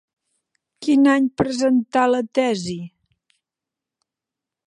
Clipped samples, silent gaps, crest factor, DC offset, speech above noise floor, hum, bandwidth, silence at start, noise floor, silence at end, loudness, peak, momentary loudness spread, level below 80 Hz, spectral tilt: under 0.1%; none; 18 dB; under 0.1%; 69 dB; none; 11 kHz; 0.8 s; -87 dBFS; 1.8 s; -19 LUFS; -4 dBFS; 14 LU; -56 dBFS; -5.5 dB/octave